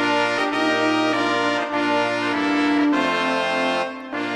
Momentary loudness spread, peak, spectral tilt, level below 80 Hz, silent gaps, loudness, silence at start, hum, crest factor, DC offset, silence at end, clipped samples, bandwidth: 3 LU; -4 dBFS; -4 dB/octave; -66 dBFS; none; -20 LUFS; 0 s; none; 16 dB; under 0.1%; 0 s; under 0.1%; 11 kHz